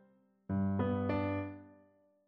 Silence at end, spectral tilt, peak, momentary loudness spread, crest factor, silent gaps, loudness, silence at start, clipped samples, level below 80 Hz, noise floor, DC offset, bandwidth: 0.55 s; -8 dB/octave; -22 dBFS; 11 LU; 16 dB; none; -36 LUFS; 0.5 s; under 0.1%; -64 dBFS; -68 dBFS; under 0.1%; 5.2 kHz